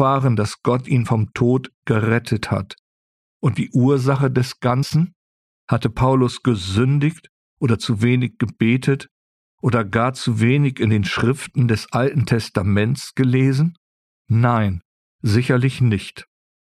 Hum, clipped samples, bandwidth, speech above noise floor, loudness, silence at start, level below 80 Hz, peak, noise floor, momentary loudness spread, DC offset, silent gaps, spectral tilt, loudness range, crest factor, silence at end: none; under 0.1%; 12.5 kHz; over 72 dB; -19 LUFS; 0 s; -48 dBFS; -4 dBFS; under -90 dBFS; 7 LU; under 0.1%; 1.74-1.82 s, 2.79-3.40 s, 5.16-5.67 s, 7.29-7.57 s, 9.11-9.58 s, 13.77-14.25 s, 14.85-15.19 s; -7 dB/octave; 2 LU; 14 dB; 0.45 s